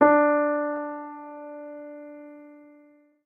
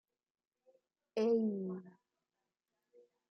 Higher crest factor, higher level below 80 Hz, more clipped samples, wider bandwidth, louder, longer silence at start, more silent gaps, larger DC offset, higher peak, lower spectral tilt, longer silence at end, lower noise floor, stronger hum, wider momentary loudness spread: about the same, 20 dB vs 18 dB; first, -72 dBFS vs under -90 dBFS; neither; second, 3.5 kHz vs 6.4 kHz; first, -24 LUFS vs -36 LUFS; second, 0 s vs 1.15 s; neither; neither; first, -6 dBFS vs -24 dBFS; first, -9.5 dB/octave vs -8 dB/octave; second, 0.85 s vs 1.4 s; second, -57 dBFS vs under -90 dBFS; neither; first, 24 LU vs 12 LU